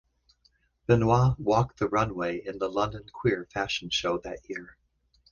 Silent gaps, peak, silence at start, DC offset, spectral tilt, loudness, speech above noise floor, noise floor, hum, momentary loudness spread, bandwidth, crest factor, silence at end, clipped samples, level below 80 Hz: none; -8 dBFS; 0.9 s; under 0.1%; -6 dB/octave; -27 LUFS; 41 dB; -68 dBFS; none; 14 LU; 7.2 kHz; 20 dB; 0.6 s; under 0.1%; -50 dBFS